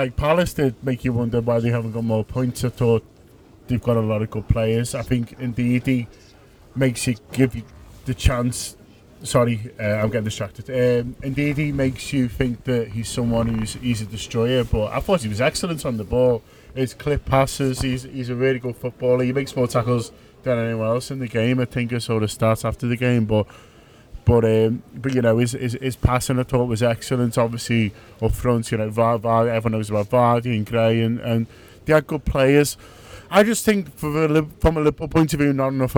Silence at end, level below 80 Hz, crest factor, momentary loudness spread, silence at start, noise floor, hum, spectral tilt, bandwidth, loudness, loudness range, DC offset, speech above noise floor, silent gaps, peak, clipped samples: 0 s; -36 dBFS; 18 dB; 8 LU; 0 s; -48 dBFS; none; -6 dB/octave; 19 kHz; -21 LUFS; 3 LU; under 0.1%; 28 dB; none; -2 dBFS; under 0.1%